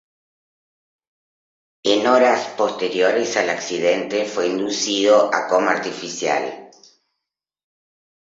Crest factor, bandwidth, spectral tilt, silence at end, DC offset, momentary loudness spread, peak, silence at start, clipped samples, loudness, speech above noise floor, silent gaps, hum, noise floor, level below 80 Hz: 20 dB; 7.8 kHz; -2.5 dB/octave; 1.6 s; under 0.1%; 8 LU; -2 dBFS; 1.85 s; under 0.1%; -19 LUFS; 64 dB; none; none; -83 dBFS; -68 dBFS